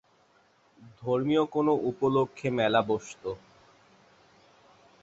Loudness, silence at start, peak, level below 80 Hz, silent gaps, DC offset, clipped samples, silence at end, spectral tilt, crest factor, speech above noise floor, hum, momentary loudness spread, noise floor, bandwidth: -28 LUFS; 0.8 s; -10 dBFS; -66 dBFS; none; under 0.1%; under 0.1%; 1.65 s; -6.5 dB/octave; 20 dB; 37 dB; none; 13 LU; -64 dBFS; 8 kHz